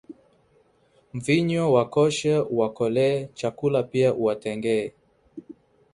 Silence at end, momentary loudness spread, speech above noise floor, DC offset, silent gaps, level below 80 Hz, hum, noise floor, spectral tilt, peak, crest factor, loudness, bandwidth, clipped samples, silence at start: 0.4 s; 11 LU; 39 dB; under 0.1%; none; -62 dBFS; none; -62 dBFS; -6 dB/octave; -6 dBFS; 20 dB; -23 LUFS; 11.5 kHz; under 0.1%; 0.1 s